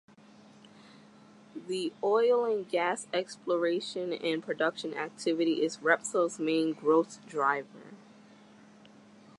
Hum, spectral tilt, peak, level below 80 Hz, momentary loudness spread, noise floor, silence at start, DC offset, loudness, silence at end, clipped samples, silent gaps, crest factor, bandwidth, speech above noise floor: none; -4 dB/octave; -10 dBFS; -86 dBFS; 10 LU; -56 dBFS; 1.55 s; under 0.1%; -30 LUFS; 1.45 s; under 0.1%; none; 22 dB; 11.5 kHz; 26 dB